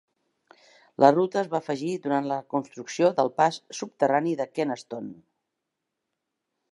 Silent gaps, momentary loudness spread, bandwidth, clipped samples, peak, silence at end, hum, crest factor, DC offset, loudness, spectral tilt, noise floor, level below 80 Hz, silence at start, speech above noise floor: none; 16 LU; 11 kHz; under 0.1%; -2 dBFS; 1.6 s; none; 24 dB; under 0.1%; -25 LUFS; -5.5 dB/octave; -83 dBFS; -80 dBFS; 1 s; 58 dB